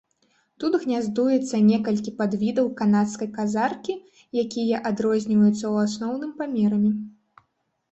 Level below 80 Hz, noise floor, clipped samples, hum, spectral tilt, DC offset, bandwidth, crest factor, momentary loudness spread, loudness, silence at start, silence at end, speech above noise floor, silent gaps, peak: -64 dBFS; -73 dBFS; under 0.1%; none; -6.5 dB/octave; under 0.1%; 8.2 kHz; 14 dB; 10 LU; -23 LUFS; 0.6 s; 0.8 s; 51 dB; none; -10 dBFS